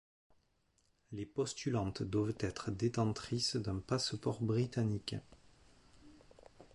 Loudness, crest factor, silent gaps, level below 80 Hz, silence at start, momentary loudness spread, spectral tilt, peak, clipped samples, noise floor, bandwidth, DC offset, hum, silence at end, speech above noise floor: -38 LUFS; 18 dB; none; -60 dBFS; 1.1 s; 8 LU; -5.5 dB/octave; -22 dBFS; under 0.1%; -76 dBFS; 11.5 kHz; under 0.1%; none; 0.1 s; 39 dB